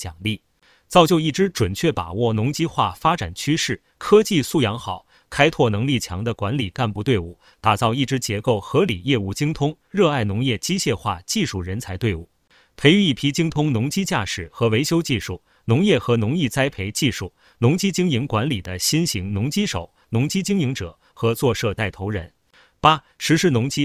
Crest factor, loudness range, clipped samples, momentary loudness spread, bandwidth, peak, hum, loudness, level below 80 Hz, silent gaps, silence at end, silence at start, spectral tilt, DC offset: 20 dB; 2 LU; under 0.1%; 10 LU; 16 kHz; 0 dBFS; none; -21 LUFS; -44 dBFS; none; 0 s; 0 s; -5 dB/octave; under 0.1%